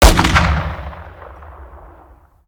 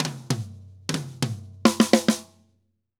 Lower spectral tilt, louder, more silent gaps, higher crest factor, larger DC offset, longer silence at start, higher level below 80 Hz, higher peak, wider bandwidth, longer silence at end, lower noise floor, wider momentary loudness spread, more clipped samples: about the same, -4.5 dB/octave vs -4.5 dB/octave; first, -15 LUFS vs -25 LUFS; neither; second, 16 dB vs 24 dB; neither; about the same, 0 s vs 0 s; first, -20 dBFS vs -68 dBFS; about the same, 0 dBFS vs 0 dBFS; first, over 20 kHz vs 17 kHz; about the same, 0.7 s vs 0.75 s; second, -46 dBFS vs -70 dBFS; first, 26 LU vs 12 LU; neither